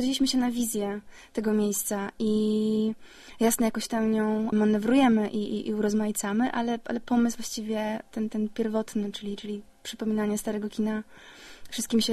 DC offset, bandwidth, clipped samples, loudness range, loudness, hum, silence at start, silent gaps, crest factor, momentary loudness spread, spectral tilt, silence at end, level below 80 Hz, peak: under 0.1%; 13 kHz; under 0.1%; 6 LU; -27 LUFS; none; 0 s; none; 16 dB; 12 LU; -4.5 dB/octave; 0 s; -56 dBFS; -10 dBFS